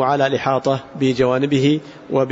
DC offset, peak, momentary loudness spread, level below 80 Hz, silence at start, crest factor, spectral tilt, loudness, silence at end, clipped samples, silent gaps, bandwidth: under 0.1%; -4 dBFS; 6 LU; -52 dBFS; 0 s; 14 dB; -6.5 dB/octave; -18 LUFS; 0 s; under 0.1%; none; 8 kHz